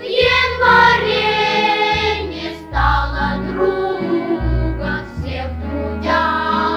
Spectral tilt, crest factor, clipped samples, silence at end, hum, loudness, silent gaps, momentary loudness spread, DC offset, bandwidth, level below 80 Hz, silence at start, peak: -5.5 dB/octave; 16 dB; under 0.1%; 0 s; none; -16 LUFS; none; 12 LU; under 0.1%; over 20 kHz; -28 dBFS; 0 s; -2 dBFS